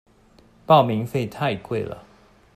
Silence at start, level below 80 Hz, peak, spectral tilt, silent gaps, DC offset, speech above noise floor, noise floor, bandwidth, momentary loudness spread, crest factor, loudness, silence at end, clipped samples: 0.7 s; -58 dBFS; -4 dBFS; -7 dB/octave; none; under 0.1%; 33 dB; -54 dBFS; 15 kHz; 15 LU; 20 dB; -21 LUFS; 0.55 s; under 0.1%